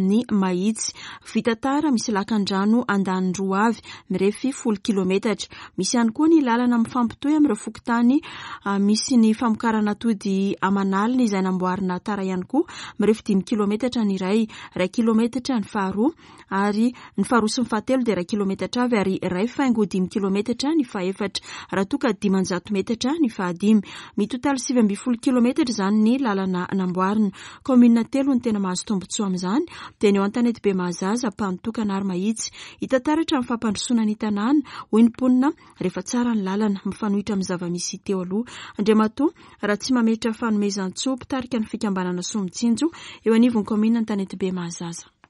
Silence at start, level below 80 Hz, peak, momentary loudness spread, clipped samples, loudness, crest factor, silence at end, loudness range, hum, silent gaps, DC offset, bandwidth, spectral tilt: 0 s; -58 dBFS; -6 dBFS; 8 LU; under 0.1%; -22 LUFS; 16 dB; 0.3 s; 3 LU; none; none; under 0.1%; 11.5 kHz; -5.5 dB/octave